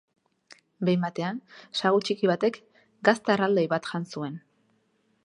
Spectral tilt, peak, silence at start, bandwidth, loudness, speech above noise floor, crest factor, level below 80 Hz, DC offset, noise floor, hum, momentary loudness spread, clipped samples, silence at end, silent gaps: -6 dB/octave; -4 dBFS; 0.5 s; 11 kHz; -26 LUFS; 44 dB; 24 dB; -76 dBFS; under 0.1%; -69 dBFS; none; 12 LU; under 0.1%; 0.85 s; none